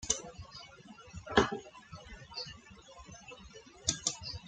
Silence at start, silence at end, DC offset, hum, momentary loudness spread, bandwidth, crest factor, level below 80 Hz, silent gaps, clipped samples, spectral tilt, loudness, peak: 0 s; 0 s; under 0.1%; none; 23 LU; 10.5 kHz; 30 dB; -56 dBFS; none; under 0.1%; -2.5 dB/octave; -35 LUFS; -10 dBFS